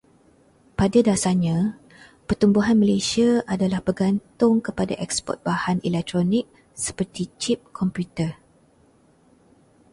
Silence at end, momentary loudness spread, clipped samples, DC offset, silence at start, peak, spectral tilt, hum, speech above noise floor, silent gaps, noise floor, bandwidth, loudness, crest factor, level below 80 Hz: 1.6 s; 10 LU; under 0.1%; under 0.1%; 0.8 s; -4 dBFS; -5.5 dB/octave; none; 36 dB; none; -57 dBFS; 11.5 kHz; -22 LUFS; 18 dB; -48 dBFS